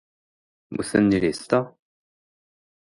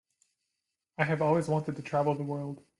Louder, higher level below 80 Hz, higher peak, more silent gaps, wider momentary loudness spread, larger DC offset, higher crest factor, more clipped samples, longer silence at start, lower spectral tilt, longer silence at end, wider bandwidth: first, -22 LUFS vs -30 LUFS; first, -54 dBFS vs -70 dBFS; first, -6 dBFS vs -12 dBFS; neither; first, 15 LU vs 9 LU; neither; about the same, 20 dB vs 20 dB; neither; second, 0.7 s vs 1 s; second, -6 dB/octave vs -7.5 dB/octave; first, 1.3 s vs 0.2 s; about the same, 11.5 kHz vs 11.5 kHz